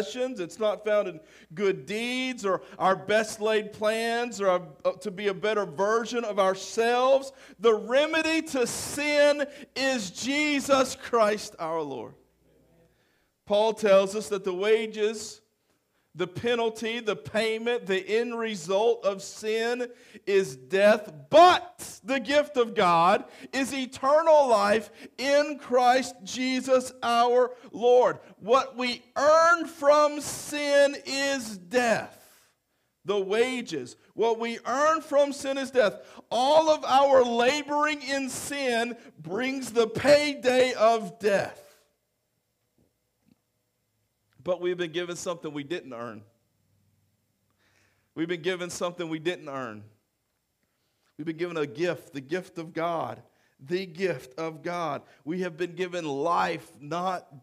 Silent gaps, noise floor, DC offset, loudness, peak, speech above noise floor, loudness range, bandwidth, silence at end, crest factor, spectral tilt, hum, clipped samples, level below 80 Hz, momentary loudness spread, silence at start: none; -77 dBFS; under 0.1%; -26 LUFS; -8 dBFS; 51 dB; 11 LU; 15.5 kHz; 0.05 s; 20 dB; -3.5 dB/octave; none; under 0.1%; -68 dBFS; 13 LU; 0 s